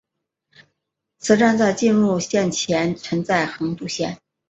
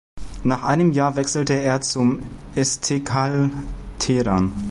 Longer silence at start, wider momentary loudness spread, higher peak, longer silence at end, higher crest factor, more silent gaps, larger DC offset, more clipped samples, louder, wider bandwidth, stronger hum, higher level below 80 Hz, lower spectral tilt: first, 1.25 s vs 0.15 s; about the same, 10 LU vs 10 LU; first, -2 dBFS vs -6 dBFS; first, 0.35 s vs 0 s; about the same, 18 dB vs 14 dB; neither; neither; neither; about the same, -20 LUFS vs -21 LUFS; second, 8.2 kHz vs 11.5 kHz; neither; second, -58 dBFS vs -38 dBFS; about the same, -4.5 dB/octave vs -5 dB/octave